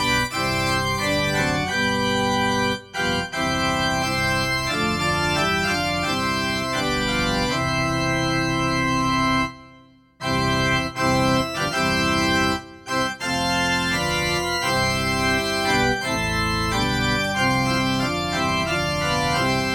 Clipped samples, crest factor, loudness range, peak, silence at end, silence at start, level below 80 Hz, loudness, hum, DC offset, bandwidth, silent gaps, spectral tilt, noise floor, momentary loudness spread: under 0.1%; 14 dB; 1 LU; -8 dBFS; 0 s; 0 s; -40 dBFS; -21 LUFS; none; under 0.1%; 18 kHz; none; -4 dB/octave; -51 dBFS; 3 LU